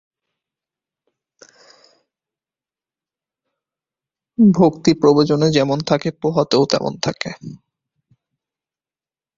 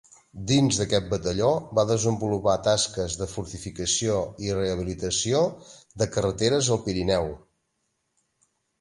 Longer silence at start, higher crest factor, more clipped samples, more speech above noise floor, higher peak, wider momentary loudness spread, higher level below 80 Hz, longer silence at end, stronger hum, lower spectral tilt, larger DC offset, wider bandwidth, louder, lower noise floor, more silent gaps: first, 4.4 s vs 0.35 s; about the same, 20 dB vs 18 dB; neither; first, over 74 dB vs 51 dB; first, 0 dBFS vs -8 dBFS; first, 15 LU vs 9 LU; second, -56 dBFS vs -46 dBFS; first, 1.85 s vs 1.45 s; neither; first, -6 dB/octave vs -4.5 dB/octave; neither; second, 7.6 kHz vs 11.5 kHz; first, -16 LUFS vs -25 LUFS; first, under -90 dBFS vs -76 dBFS; neither